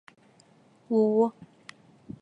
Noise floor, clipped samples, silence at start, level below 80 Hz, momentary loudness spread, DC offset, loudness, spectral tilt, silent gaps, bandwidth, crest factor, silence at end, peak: -60 dBFS; under 0.1%; 0.9 s; -72 dBFS; 25 LU; under 0.1%; -25 LUFS; -8.5 dB/octave; none; 9.6 kHz; 18 dB; 0.1 s; -12 dBFS